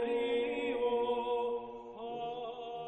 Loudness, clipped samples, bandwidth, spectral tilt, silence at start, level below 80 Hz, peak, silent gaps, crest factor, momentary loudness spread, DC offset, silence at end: -35 LUFS; under 0.1%; 8.4 kHz; -5.5 dB/octave; 0 s; -68 dBFS; -22 dBFS; none; 12 dB; 10 LU; under 0.1%; 0 s